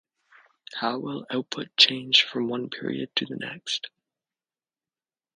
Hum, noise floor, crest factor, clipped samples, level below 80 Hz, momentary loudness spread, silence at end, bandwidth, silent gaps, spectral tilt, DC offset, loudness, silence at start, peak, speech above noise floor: none; under -90 dBFS; 26 dB; under 0.1%; -76 dBFS; 14 LU; 1.5 s; 10.5 kHz; none; -3 dB/octave; under 0.1%; -24 LUFS; 0.7 s; -2 dBFS; over 63 dB